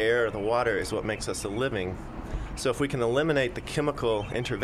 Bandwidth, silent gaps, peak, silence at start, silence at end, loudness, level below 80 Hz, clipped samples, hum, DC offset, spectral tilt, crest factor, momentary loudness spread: 14 kHz; none; -12 dBFS; 0 s; 0 s; -28 LUFS; -42 dBFS; under 0.1%; none; under 0.1%; -5 dB/octave; 14 dB; 9 LU